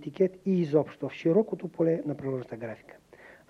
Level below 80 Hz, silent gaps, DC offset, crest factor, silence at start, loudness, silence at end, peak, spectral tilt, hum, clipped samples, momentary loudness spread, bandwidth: -70 dBFS; none; under 0.1%; 18 dB; 0 s; -29 LUFS; 0.2 s; -10 dBFS; -9 dB/octave; none; under 0.1%; 14 LU; 7.6 kHz